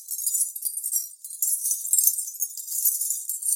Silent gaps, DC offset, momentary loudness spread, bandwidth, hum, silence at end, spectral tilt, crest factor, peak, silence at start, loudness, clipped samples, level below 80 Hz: none; under 0.1%; 8 LU; 17 kHz; none; 0 s; 12 dB/octave; 26 dB; -2 dBFS; 0 s; -23 LUFS; under 0.1%; under -90 dBFS